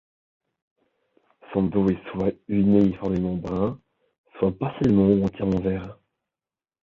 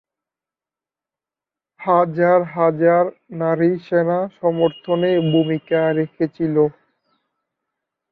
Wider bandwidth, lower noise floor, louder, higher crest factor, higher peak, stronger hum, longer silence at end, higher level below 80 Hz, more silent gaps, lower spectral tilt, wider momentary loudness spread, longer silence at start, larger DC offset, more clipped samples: first, 6 kHz vs 4.7 kHz; about the same, under -90 dBFS vs -90 dBFS; second, -23 LUFS vs -18 LUFS; about the same, 18 dB vs 18 dB; second, -6 dBFS vs -2 dBFS; neither; second, 0.9 s vs 1.4 s; first, -48 dBFS vs -64 dBFS; first, 4.18-4.24 s vs none; about the same, -10 dB/octave vs -10 dB/octave; first, 10 LU vs 6 LU; second, 1.5 s vs 1.8 s; neither; neither